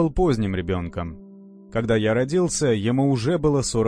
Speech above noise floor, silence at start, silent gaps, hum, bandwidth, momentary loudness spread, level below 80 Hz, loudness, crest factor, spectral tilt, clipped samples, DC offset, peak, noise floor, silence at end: 23 dB; 0 s; none; none; 10.5 kHz; 10 LU; -38 dBFS; -22 LUFS; 14 dB; -6 dB/octave; under 0.1%; under 0.1%; -8 dBFS; -44 dBFS; 0 s